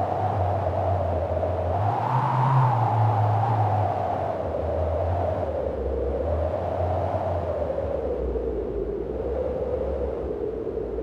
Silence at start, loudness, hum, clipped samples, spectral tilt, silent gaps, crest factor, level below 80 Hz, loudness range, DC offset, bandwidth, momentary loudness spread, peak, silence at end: 0 s; -26 LUFS; none; under 0.1%; -9.5 dB/octave; none; 14 dB; -36 dBFS; 5 LU; under 0.1%; 6.6 kHz; 7 LU; -10 dBFS; 0 s